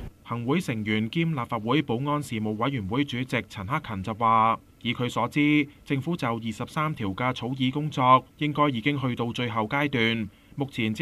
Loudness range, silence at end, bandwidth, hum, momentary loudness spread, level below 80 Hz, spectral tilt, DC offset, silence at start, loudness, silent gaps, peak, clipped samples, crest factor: 3 LU; 0 s; 14.5 kHz; none; 9 LU; -56 dBFS; -6.5 dB/octave; under 0.1%; 0 s; -26 LUFS; none; -6 dBFS; under 0.1%; 20 dB